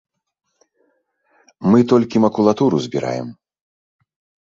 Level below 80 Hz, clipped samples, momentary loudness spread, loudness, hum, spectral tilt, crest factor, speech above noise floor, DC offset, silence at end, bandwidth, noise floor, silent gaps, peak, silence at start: -58 dBFS; under 0.1%; 12 LU; -17 LUFS; none; -7.5 dB/octave; 18 dB; 49 dB; under 0.1%; 1.15 s; 7.6 kHz; -65 dBFS; none; -2 dBFS; 1.6 s